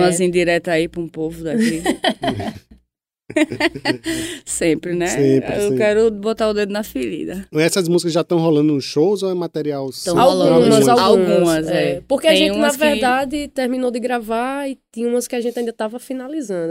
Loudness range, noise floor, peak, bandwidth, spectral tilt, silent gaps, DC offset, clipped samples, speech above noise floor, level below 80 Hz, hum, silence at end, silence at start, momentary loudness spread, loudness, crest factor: 7 LU; -69 dBFS; 0 dBFS; 16 kHz; -4.5 dB/octave; none; under 0.1%; under 0.1%; 52 dB; -48 dBFS; none; 0 s; 0 s; 11 LU; -18 LUFS; 16 dB